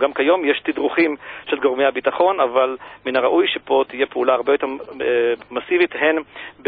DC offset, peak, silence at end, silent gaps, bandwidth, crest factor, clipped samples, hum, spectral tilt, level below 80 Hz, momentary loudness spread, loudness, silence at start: under 0.1%; -2 dBFS; 0.15 s; none; 4.9 kHz; 16 dB; under 0.1%; 50 Hz at -60 dBFS; -8.5 dB/octave; -62 dBFS; 8 LU; -19 LUFS; 0 s